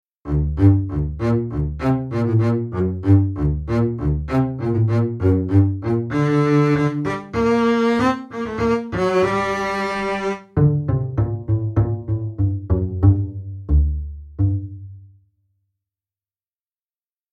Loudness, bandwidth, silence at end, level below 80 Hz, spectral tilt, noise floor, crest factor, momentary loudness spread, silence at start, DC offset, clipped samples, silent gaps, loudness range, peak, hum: -20 LUFS; 8.8 kHz; 2.25 s; -30 dBFS; -8.5 dB/octave; under -90 dBFS; 18 dB; 8 LU; 0.25 s; under 0.1%; under 0.1%; none; 4 LU; -2 dBFS; none